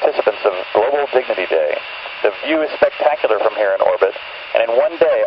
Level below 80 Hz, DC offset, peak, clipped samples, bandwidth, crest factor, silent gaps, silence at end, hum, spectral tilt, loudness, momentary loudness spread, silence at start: -58 dBFS; under 0.1%; 0 dBFS; under 0.1%; 5.8 kHz; 16 dB; none; 0 s; none; -7 dB/octave; -17 LUFS; 5 LU; 0 s